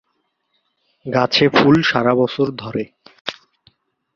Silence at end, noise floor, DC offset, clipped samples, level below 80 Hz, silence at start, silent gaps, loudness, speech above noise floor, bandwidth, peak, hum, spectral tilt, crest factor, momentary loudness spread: 0.85 s; -70 dBFS; under 0.1%; under 0.1%; -54 dBFS; 1.05 s; 3.21-3.25 s; -16 LUFS; 54 dB; 7.2 kHz; 0 dBFS; none; -6 dB/octave; 18 dB; 17 LU